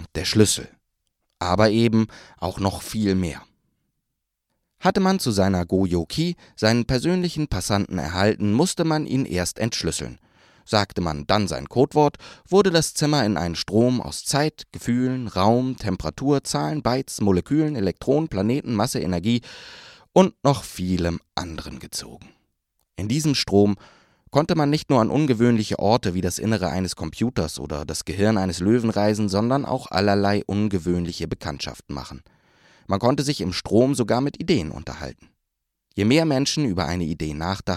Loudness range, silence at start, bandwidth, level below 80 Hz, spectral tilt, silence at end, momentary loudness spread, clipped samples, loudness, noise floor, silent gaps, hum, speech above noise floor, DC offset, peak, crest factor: 4 LU; 0 s; 15 kHz; -46 dBFS; -5.5 dB/octave; 0 s; 11 LU; under 0.1%; -22 LUFS; -80 dBFS; none; none; 58 dB; under 0.1%; 0 dBFS; 22 dB